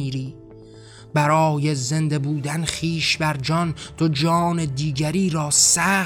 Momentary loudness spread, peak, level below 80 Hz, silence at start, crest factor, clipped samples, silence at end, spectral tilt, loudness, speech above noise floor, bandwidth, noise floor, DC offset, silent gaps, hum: 9 LU; -4 dBFS; -50 dBFS; 0 s; 18 dB; under 0.1%; 0 s; -4 dB/octave; -20 LUFS; 22 dB; 18 kHz; -43 dBFS; under 0.1%; none; none